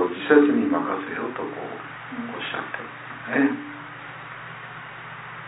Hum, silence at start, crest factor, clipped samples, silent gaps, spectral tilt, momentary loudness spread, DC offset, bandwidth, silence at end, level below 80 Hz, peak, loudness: none; 0 s; 22 dB; under 0.1%; none; -9.5 dB/octave; 19 LU; under 0.1%; 4 kHz; 0 s; -70 dBFS; -2 dBFS; -24 LUFS